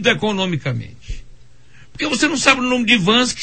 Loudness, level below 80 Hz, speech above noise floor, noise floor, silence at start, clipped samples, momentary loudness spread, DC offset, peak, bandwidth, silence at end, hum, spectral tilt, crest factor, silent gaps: -16 LUFS; -38 dBFS; 31 dB; -48 dBFS; 0 s; under 0.1%; 22 LU; 0.9%; 0 dBFS; 9 kHz; 0 s; none; -3.5 dB/octave; 18 dB; none